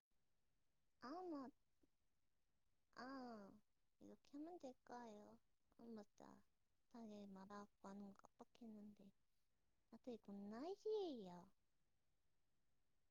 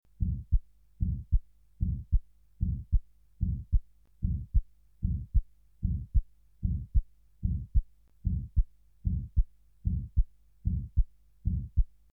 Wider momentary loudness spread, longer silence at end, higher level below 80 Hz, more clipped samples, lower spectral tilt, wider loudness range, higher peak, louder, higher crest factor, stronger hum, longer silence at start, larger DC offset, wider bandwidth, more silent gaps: first, 16 LU vs 6 LU; first, 1.6 s vs 0.3 s; second, under -90 dBFS vs -32 dBFS; neither; second, -5 dB/octave vs -12.5 dB/octave; first, 7 LU vs 1 LU; second, -40 dBFS vs -14 dBFS; second, -57 LUFS vs -35 LUFS; about the same, 20 dB vs 16 dB; neither; second, 0.05 s vs 0.2 s; neither; first, 7.2 kHz vs 0.5 kHz; neither